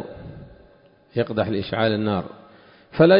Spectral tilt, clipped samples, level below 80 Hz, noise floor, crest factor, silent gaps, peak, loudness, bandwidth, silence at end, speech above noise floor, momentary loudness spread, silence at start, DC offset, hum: -11.5 dB/octave; under 0.1%; -50 dBFS; -54 dBFS; 18 dB; none; -4 dBFS; -24 LUFS; 5.4 kHz; 0 s; 31 dB; 20 LU; 0 s; under 0.1%; none